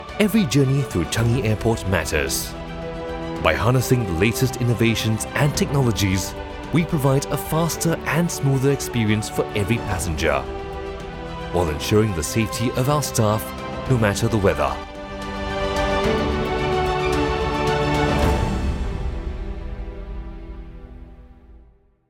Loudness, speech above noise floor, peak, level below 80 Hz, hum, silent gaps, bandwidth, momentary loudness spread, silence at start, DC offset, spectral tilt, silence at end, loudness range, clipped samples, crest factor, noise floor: -21 LUFS; 32 dB; 0 dBFS; -34 dBFS; none; none; 19 kHz; 12 LU; 0 s; under 0.1%; -5.5 dB/octave; 0.5 s; 3 LU; under 0.1%; 20 dB; -52 dBFS